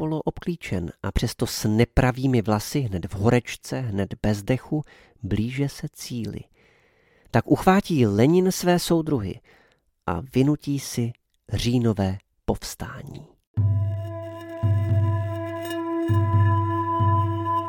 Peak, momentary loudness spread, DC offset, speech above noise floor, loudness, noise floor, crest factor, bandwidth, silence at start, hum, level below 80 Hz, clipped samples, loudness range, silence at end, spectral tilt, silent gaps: -2 dBFS; 13 LU; under 0.1%; 38 dB; -24 LUFS; -62 dBFS; 20 dB; 17 kHz; 0 s; none; -42 dBFS; under 0.1%; 5 LU; 0 s; -6.5 dB/octave; 13.47-13.54 s